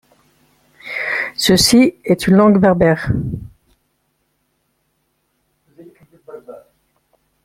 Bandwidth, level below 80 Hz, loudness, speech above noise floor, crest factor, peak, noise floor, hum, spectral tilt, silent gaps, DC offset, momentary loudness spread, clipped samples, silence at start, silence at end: 16 kHz; -42 dBFS; -14 LUFS; 54 dB; 18 dB; 0 dBFS; -67 dBFS; none; -5 dB/octave; none; under 0.1%; 25 LU; under 0.1%; 0.85 s; 0.85 s